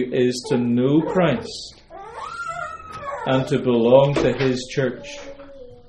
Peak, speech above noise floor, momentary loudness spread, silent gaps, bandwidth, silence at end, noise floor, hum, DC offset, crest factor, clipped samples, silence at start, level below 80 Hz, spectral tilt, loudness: 0 dBFS; 21 dB; 21 LU; none; 11.5 kHz; 0.1 s; -40 dBFS; none; under 0.1%; 20 dB; under 0.1%; 0 s; -48 dBFS; -6.5 dB/octave; -20 LUFS